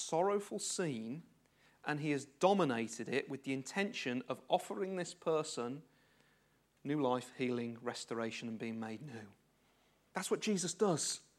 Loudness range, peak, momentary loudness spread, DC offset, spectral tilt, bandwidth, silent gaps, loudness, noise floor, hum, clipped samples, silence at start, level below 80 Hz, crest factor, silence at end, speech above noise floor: 4 LU; -16 dBFS; 12 LU; under 0.1%; -4 dB/octave; 15 kHz; none; -38 LUFS; -74 dBFS; none; under 0.1%; 0 s; -86 dBFS; 22 dB; 0.15 s; 36 dB